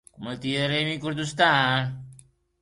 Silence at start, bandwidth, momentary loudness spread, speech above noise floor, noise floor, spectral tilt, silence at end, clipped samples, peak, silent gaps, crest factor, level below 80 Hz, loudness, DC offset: 0.2 s; 11.5 kHz; 14 LU; 29 dB; -54 dBFS; -4.5 dB/octave; 0.45 s; under 0.1%; -6 dBFS; none; 20 dB; -60 dBFS; -24 LUFS; under 0.1%